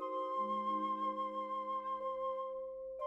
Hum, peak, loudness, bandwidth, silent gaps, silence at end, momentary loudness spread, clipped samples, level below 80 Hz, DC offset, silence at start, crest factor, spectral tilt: none; -28 dBFS; -39 LUFS; 7.8 kHz; none; 0 s; 6 LU; under 0.1%; -78 dBFS; under 0.1%; 0 s; 12 dB; -6.5 dB/octave